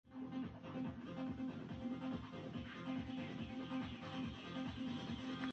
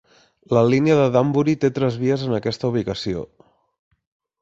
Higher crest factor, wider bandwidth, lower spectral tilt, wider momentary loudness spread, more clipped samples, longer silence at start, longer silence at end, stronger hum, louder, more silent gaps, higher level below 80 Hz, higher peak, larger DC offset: about the same, 16 dB vs 18 dB; about the same, 8 kHz vs 7.8 kHz; about the same, -6.5 dB/octave vs -7.5 dB/octave; second, 3 LU vs 10 LU; neither; second, 0.05 s vs 0.5 s; second, 0 s vs 1.15 s; neither; second, -47 LUFS vs -20 LUFS; neither; second, -64 dBFS vs -52 dBFS; second, -30 dBFS vs -2 dBFS; neither